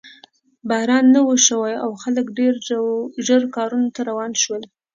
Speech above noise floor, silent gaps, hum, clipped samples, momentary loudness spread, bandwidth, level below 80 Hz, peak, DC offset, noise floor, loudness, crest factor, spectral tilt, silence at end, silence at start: 33 dB; none; none; under 0.1%; 10 LU; 7.6 kHz; -72 dBFS; 0 dBFS; under 0.1%; -51 dBFS; -18 LUFS; 18 dB; -2 dB/octave; 0.3 s; 0.05 s